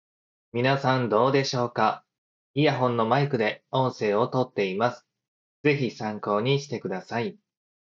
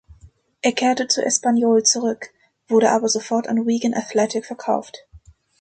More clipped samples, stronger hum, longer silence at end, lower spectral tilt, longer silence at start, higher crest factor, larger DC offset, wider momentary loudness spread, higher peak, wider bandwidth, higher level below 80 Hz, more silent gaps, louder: neither; neither; first, 0.65 s vs 0.45 s; first, -6 dB/octave vs -2.5 dB/octave; first, 0.55 s vs 0.25 s; about the same, 20 dB vs 18 dB; neither; about the same, 9 LU vs 9 LU; about the same, -6 dBFS vs -4 dBFS; second, 7.4 kHz vs 9.2 kHz; second, -72 dBFS vs -58 dBFS; first, 2.18-2.54 s, 5.28-5.64 s vs none; second, -25 LUFS vs -19 LUFS